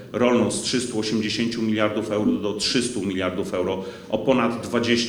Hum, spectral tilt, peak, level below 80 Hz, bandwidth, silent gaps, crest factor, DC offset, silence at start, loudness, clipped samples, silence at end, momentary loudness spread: none; -4 dB/octave; -4 dBFS; -54 dBFS; 19.5 kHz; none; 18 dB; under 0.1%; 0 s; -23 LUFS; under 0.1%; 0 s; 5 LU